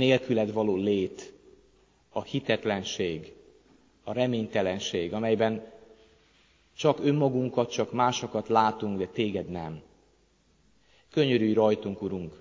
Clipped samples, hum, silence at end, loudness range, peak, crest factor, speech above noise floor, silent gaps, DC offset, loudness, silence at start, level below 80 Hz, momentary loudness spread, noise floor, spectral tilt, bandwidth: under 0.1%; none; 0.05 s; 4 LU; -8 dBFS; 20 dB; 38 dB; none; under 0.1%; -28 LUFS; 0 s; -60 dBFS; 13 LU; -65 dBFS; -5.5 dB/octave; 7.6 kHz